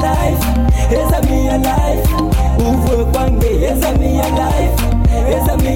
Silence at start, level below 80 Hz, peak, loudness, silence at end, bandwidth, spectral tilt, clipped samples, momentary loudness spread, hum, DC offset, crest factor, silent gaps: 0 s; -16 dBFS; -2 dBFS; -14 LUFS; 0 s; 17 kHz; -6.5 dB/octave; under 0.1%; 1 LU; none; under 0.1%; 10 dB; none